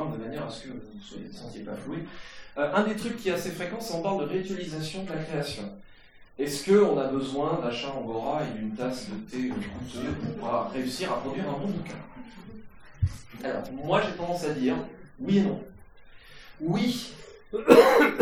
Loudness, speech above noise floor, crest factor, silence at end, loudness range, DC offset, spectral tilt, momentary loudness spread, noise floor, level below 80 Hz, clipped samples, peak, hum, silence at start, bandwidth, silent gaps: -28 LUFS; 21 dB; 28 dB; 0 s; 5 LU; under 0.1%; -5.5 dB/octave; 18 LU; -48 dBFS; -52 dBFS; under 0.1%; 0 dBFS; none; 0 s; 18 kHz; none